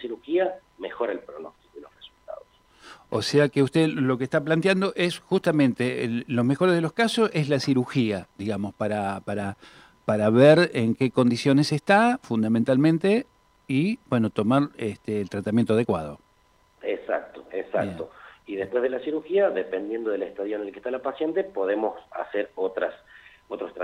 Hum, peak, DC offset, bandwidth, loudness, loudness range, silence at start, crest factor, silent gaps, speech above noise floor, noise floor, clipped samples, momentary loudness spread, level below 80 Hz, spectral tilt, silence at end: none; -6 dBFS; under 0.1%; 14 kHz; -24 LUFS; 8 LU; 0 s; 20 dB; none; 38 dB; -62 dBFS; under 0.1%; 15 LU; -64 dBFS; -6.5 dB/octave; 0 s